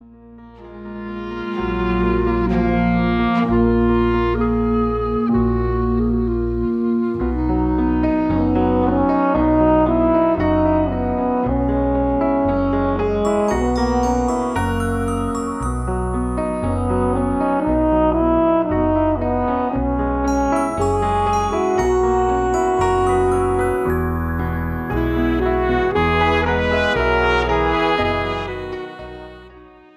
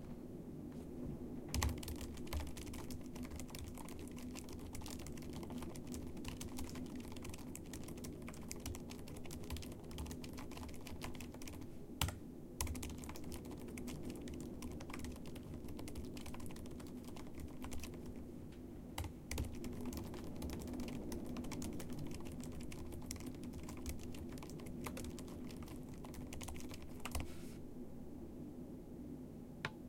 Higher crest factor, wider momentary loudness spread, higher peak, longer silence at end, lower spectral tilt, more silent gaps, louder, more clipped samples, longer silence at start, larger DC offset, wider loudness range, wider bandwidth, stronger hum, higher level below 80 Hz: second, 14 dB vs 28 dB; about the same, 6 LU vs 6 LU; first, -4 dBFS vs -18 dBFS; first, 0.35 s vs 0 s; first, -7 dB/octave vs -5 dB/octave; neither; first, -18 LUFS vs -48 LUFS; neither; first, 0.25 s vs 0 s; neither; about the same, 3 LU vs 4 LU; second, 14 kHz vs 17 kHz; neither; first, -28 dBFS vs -54 dBFS